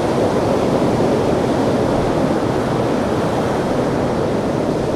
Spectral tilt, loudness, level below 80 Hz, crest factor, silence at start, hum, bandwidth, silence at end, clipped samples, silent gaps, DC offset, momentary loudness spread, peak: -6.5 dB/octave; -17 LUFS; -38 dBFS; 12 dB; 0 s; none; 14.5 kHz; 0 s; under 0.1%; none; under 0.1%; 2 LU; -4 dBFS